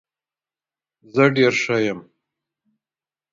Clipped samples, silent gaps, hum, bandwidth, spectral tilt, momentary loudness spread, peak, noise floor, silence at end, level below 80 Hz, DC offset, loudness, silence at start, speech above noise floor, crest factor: under 0.1%; none; none; 7.6 kHz; -5.5 dB/octave; 11 LU; 0 dBFS; under -90 dBFS; 1.3 s; -64 dBFS; under 0.1%; -19 LUFS; 1.15 s; over 72 dB; 22 dB